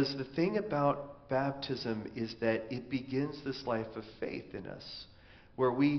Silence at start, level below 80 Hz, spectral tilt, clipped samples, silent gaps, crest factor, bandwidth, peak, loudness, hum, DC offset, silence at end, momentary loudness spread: 0 s; -64 dBFS; -5 dB/octave; under 0.1%; none; 18 dB; 6.4 kHz; -16 dBFS; -35 LUFS; none; under 0.1%; 0 s; 13 LU